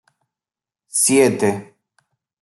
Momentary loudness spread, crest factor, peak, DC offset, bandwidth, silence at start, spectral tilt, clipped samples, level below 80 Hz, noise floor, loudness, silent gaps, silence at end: 11 LU; 18 dB; -2 dBFS; under 0.1%; 12.5 kHz; 0.95 s; -3.5 dB/octave; under 0.1%; -66 dBFS; -90 dBFS; -16 LUFS; none; 0.75 s